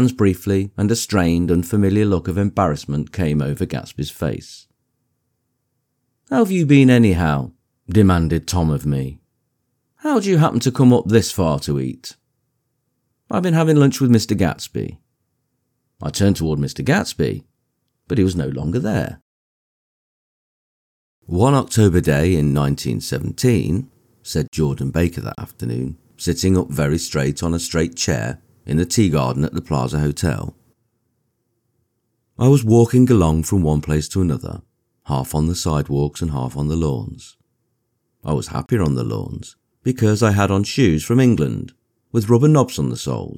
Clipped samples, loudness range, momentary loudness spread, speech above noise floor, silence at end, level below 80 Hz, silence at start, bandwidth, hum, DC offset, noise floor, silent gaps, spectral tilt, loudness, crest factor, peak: under 0.1%; 7 LU; 13 LU; 55 dB; 0 s; -38 dBFS; 0 s; 18.5 kHz; none; under 0.1%; -72 dBFS; 19.22-21.22 s, 24.48-24.52 s; -6.5 dB/octave; -18 LUFS; 18 dB; -2 dBFS